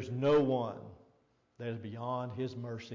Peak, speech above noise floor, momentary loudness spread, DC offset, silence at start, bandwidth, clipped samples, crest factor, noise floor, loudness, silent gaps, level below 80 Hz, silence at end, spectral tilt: -20 dBFS; 38 dB; 16 LU; under 0.1%; 0 s; 7.4 kHz; under 0.1%; 14 dB; -71 dBFS; -34 LUFS; none; -66 dBFS; 0 s; -8 dB/octave